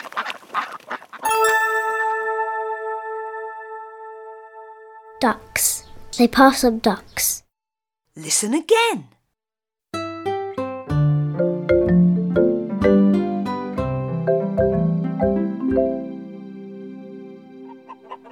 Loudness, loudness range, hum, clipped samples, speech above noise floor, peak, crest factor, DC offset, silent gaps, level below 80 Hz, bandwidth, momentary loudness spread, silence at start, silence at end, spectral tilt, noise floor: -20 LUFS; 7 LU; none; under 0.1%; 71 dB; -2 dBFS; 20 dB; under 0.1%; none; -46 dBFS; over 20 kHz; 21 LU; 0 s; 0 s; -5 dB/octave; -89 dBFS